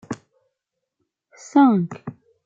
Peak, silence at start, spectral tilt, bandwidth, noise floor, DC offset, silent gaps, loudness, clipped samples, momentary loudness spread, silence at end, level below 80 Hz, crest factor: -6 dBFS; 0.1 s; -7.5 dB/octave; 7.6 kHz; -81 dBFS; under 0.1%; none; -18 LUFS; under 0.1%; 21 LU; 0.35 s; -70 dBFS; 18 dB